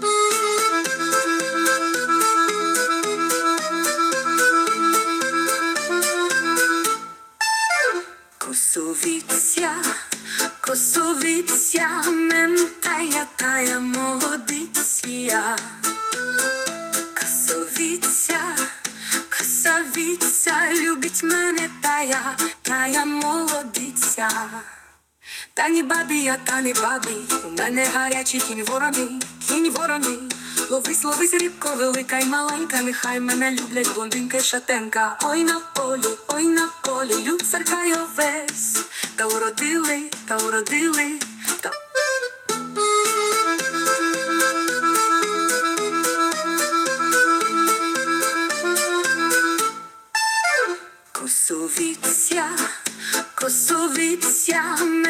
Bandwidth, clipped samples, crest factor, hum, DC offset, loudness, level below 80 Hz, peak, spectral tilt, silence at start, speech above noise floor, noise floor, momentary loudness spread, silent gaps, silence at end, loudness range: 18 kHz; under 0.1%; 16 dB; none; under 0.1%; -20 LUFS; -70 dBFS; -6 dBFS; -0.5 dB/octave; 0 s; 29 dB; -51 dBFS; 6 LU; none; 0 s; 3 LU